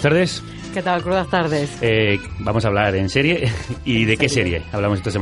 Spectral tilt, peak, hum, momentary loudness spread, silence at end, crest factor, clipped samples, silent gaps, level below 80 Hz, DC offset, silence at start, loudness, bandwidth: -5.5 dB/octave; -2 dBFS; none; 6 LU; 0 s; 18 dB; under 0.1%; none; -38 dBFS; under 0.1%; 0 s; -19 LUFS; 11.5 kHz